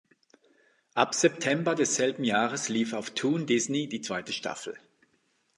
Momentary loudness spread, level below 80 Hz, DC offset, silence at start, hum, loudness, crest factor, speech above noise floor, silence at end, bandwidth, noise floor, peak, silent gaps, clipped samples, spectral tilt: 10 LU; -76 dBFS; under 0.1%; 0.95 s; none; -28 LUFS; 24 dB; 43 dB; 0.8 s; 11.5 kHz; -71 dBFS; -6 dBFS; none; under 0.1%; -3.5 dB/octave